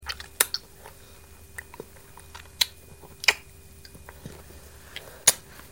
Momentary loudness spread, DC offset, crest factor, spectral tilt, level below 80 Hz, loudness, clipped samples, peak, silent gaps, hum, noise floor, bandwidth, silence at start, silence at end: 26 LU; 0.2%; 32 dB; 0.5 dB/octave; -54 dBFS; -25 LUFS; under 0.1%; 0 dBFS; none; none; -50 dBFS; over 20 kHz; 0 s; 0.1 s